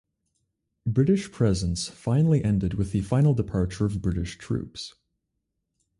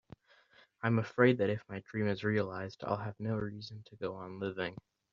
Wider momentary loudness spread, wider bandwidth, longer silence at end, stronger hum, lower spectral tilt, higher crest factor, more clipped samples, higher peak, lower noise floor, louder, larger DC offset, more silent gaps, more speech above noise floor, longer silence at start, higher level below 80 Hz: second, 10 LU vs 14 LU; first, 11.5 kHz vs 7.2 kHz; first, 1.1 s vs 0.35 s; neither; about the same, -7 dB/octave vs -6 dB/octave; second, 16 dB vs 22 dB; neither; about the same, -10 dBFS vs -12 dBFS; first, -80 dBFS vs -65 dBFS; first, -25 LUFS vs -35 LUFS; neither; neither; first, 56 dB vs 31 dB; about the same, 0.85 s vs 0.85 s; first, -42 dBFS vs -70 dBFS